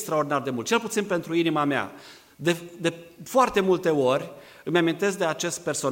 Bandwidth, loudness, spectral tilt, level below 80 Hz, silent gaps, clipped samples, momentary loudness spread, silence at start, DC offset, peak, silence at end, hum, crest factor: 16.5 kHz; -25 LUFS; -4.5 dB/octave; -64 dBFS; none; under 0.1%; 8 LU; 0 s; under 0.1%; -8 dBFS; 0 s; none; 18 dB